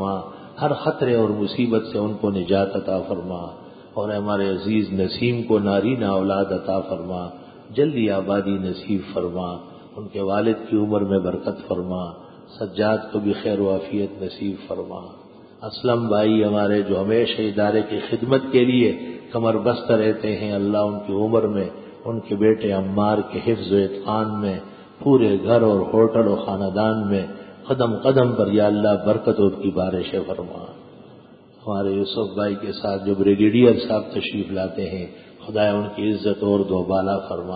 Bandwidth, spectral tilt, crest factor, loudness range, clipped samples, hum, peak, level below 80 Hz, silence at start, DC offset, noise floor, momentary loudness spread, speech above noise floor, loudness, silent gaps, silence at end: 5 kHz; -12 dB/octave; 18 dB; 5 LU; under 0.1%; none; -2 dBFS; -50 dBFS; 0 s; under 0.1%; -47 dBFS; 13 LU; 26 dB; -21 LUFS; none; 0 s